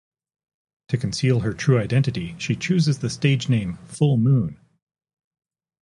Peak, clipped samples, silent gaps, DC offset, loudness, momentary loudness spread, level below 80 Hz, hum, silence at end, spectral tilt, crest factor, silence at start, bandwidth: -4 dBFS; under 0.1%; none; under 0.1%; -22 LUFS; 8 LU; -50 dBFS; none; 1.3 s; -6.5 dB/octave; 18 dB; 0.9 s; 11 kHz